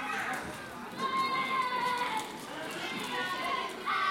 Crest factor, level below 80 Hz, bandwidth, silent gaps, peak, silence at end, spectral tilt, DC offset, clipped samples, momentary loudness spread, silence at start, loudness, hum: 14 dB; -68 dBFS; 17 kHz; none; -20 dBFS; 0 s; -2.5 dB/octave; under 0.1%; under 0.1%; 10 LU; 0 s; -33 LUFS; none